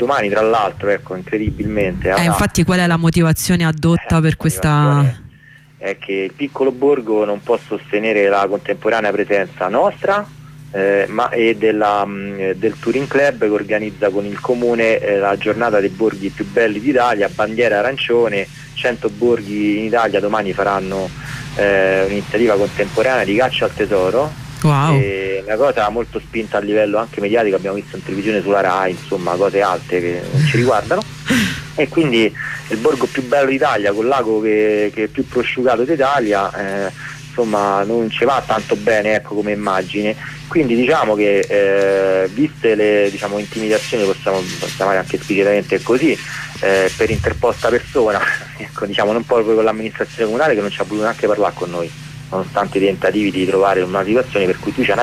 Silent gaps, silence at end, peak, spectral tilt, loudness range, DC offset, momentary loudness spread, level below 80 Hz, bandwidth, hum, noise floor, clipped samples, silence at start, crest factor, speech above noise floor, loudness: none; 0 s; -4 dBFS; -6 dB/octave; 2 LU; under 0.1%; 8 LU; -42 dBFS; 15.5 kHz; none; -44 dBFS; under 0.1%; 0 s; 12 dB; 28 dB; -16 LUFS